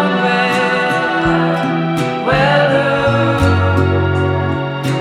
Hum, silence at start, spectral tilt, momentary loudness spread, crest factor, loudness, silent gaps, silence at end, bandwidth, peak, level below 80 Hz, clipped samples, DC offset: none; 0 s; -6.5 dB/octave; 5 LU; 12 dB; -14 LUFS; none; 0 s; 13.5 kHz; 0 dBFS; -38 dBFS; under 0.1%; under 0.1%